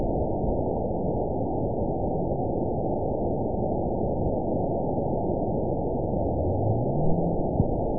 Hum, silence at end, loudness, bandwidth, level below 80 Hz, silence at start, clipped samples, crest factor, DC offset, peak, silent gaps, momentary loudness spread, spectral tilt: none; 0 s; -27 LUFS; 1 kHz; -36 dBFS; 0 s; under 0.1%; 16 dB; 2%; -10 dBFS; none; 2 LU; -19 dB/octave